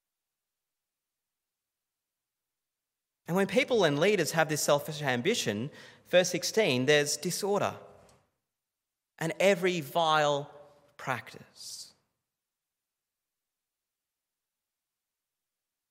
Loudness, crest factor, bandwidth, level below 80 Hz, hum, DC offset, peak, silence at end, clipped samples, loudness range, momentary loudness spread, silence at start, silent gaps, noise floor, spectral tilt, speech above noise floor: -28 LUFS; 24 dB; 16 kHz; -80 dBFS; none; under 0.1%; -8 dBFS; 4.05 s; under 0.1%; 12 LU; 17 LU; 3.3 s; none; -90 dBFS; -3.5 dB/octave; 61 dB